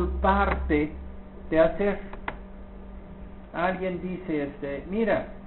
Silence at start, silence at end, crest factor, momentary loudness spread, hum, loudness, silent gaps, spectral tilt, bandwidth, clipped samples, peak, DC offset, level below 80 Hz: 0 s; 0 s; 22 dB; 21 LU; none; -27 LUFS; none; -6 dB/octave; 4.2 kHz; under 0.1%; -6 dBFS; under 0.1%; -36 dBFS